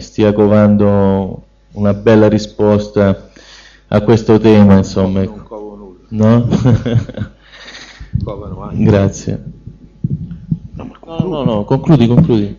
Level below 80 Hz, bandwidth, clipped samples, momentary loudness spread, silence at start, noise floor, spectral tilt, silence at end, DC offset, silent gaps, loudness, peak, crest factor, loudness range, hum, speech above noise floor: -36 dBFS; 7.4 kHz; 0.2%; 20 LU; 0 s; -40 dBFS; -8 dB/octave; 0.05 s; under 0.1%; none; -12 LUFS; 0 dBFS; 12 dB; 7 LU; none; 29 dB